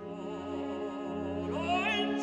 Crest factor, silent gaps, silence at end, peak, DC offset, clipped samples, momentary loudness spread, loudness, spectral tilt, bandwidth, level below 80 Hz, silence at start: 16 dB; none; 0 s; -18 dBFS; under 0.1%; under 0.1%; 9 LU; -34 LUFS; -5 dB/octave; 9.8 kHz; -62 dBFS; 0 s